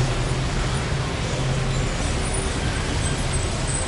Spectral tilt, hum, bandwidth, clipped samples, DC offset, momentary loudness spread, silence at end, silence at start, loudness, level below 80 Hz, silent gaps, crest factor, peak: -4.5 dB/octave; none; 11.5 kHz; under 0.1%; under 0.1%; 1 LU; 0 s; 0 s; -24 LUFS; -28 dBFS; none; 14 dB; -10 dBFS